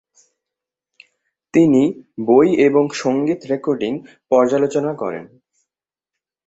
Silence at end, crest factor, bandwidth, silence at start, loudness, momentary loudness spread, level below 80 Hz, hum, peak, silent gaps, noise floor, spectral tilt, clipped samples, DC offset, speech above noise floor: 1.2 s; 16 dB; 8 kHz; 1.55 s; -17 LUFS; 13 LU; -60 dBFS; none; -2 dBFS; none; -88 dBFS; -6.5 dB/octave; under 0.1%; under 0.1%; 71 dB